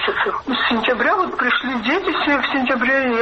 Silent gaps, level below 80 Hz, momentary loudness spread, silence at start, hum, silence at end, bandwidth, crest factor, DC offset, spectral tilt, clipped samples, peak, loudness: none; -50 dBFS; 3 LU; 0 s; none; 0 s; 7 kHz; 12 dB; under 0.1%; -4.5 dB/octave; under 0.1%; -6 dBFS; -18 LUFS